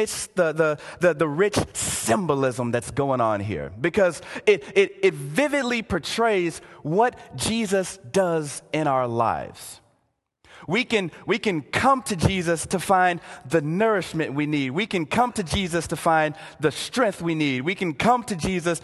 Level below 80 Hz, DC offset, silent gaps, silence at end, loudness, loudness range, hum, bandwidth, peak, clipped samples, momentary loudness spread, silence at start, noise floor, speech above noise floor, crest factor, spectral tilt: -48 dBFS; under 0.1%; none; 0.05 s; -23 LUFS; 3 LU; none; 12.5 kHz; -4 dBFS; under 0.1%; 6 LU; 0 s; -72 dBFS; 48 dB; 20 dB; -4.5 dB/octave